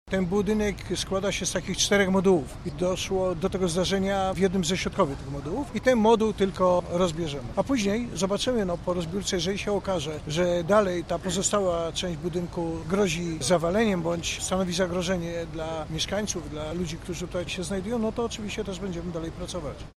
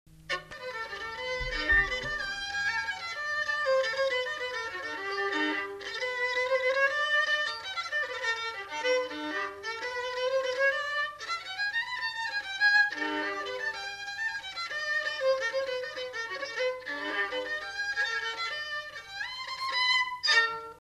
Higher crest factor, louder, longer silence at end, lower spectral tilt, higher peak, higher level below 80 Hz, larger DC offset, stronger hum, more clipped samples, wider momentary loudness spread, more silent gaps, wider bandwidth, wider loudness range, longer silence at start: about the same, 18 dB vs 18 dB; first, -27 LUFS vs -30 LUFS; about the same, 0.05 s vs 0 s; first, -4.5 dB/octave vs -1.5 dB/octave; first, -8 dBFS vs -12 dBFS; first, -44 dBFS vs -54 dBFS; neither; neither; neither; about the same, 10 LU vs 11 LU; neither; about the same, 14.5 kHz vs 13.5 kHz; about the same, 6 LU vs 4 LU; about the same, 0.05 s vs 0.1 s